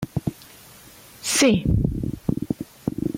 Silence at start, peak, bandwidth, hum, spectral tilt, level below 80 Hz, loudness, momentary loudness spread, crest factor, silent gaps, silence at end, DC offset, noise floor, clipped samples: 0 s; -6 dBFS; 16.5 kHz; none; -4.5 dB/octave; -36 dBFS; -23 LUFS; 14 LU; 18 dB; none; 0 s; under 0.1%; -47 dBFS; under 0.1%